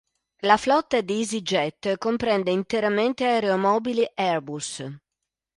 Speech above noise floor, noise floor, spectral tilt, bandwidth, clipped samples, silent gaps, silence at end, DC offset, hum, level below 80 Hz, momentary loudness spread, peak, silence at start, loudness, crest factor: 61 dB; -85 dBFS; -4.5 dB/octave; 11.5 kHz; under 0.1%; none; 0.6 s; under 0.1%; none; -62 dBFS; 9 LU; -4 dBFS; 0.45 s; -23 LUFS; 20 dB